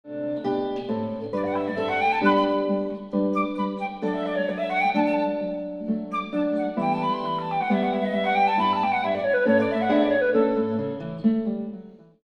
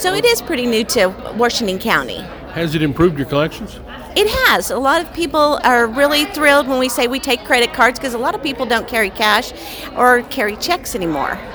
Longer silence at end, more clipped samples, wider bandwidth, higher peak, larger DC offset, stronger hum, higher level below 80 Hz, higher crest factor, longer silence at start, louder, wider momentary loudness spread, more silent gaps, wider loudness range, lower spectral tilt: first, 0.25 s vs 0 s; neither; second, 9.2 kHz vs over 20 kHz; second, -8 dBFS vs 0 dBFS; neither; neither; second, -60 dBFS vs -40 dBFS; about the same, 16 dB vs 16 dB; about the same, 0.05 s vs 0 s; second, -24 LUFS vs -15 LUFS; about the same, 8 LU vs 8 LU; neither; about the same, 4 LU vs 3 LU; first, -7.5 dB/octave vs -3.5 dB/octave